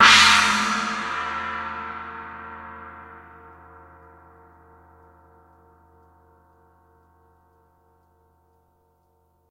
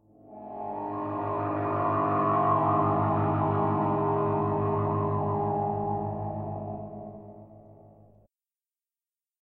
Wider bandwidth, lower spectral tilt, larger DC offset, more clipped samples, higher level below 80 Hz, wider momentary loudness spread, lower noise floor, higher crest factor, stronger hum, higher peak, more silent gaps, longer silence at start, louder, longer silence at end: first, 16 kHz vs 4.1 kHz; second, -0.5 dB/octave vs -12 dB/octave; neither; neither; about the same, -54 dBFS vs -58 dBFS; first, 28 LU vs 15 LU; second, -65 dBFS vs under -90 dBFS; first, 26 dB vs 16 dB; neither; first, 0 dBFS vs -14 dBFS; neither; second, 0 s vs 0.25 s; first, -19 LUFS vs -28 LUFS; first, 6.3 s vs 1.5 s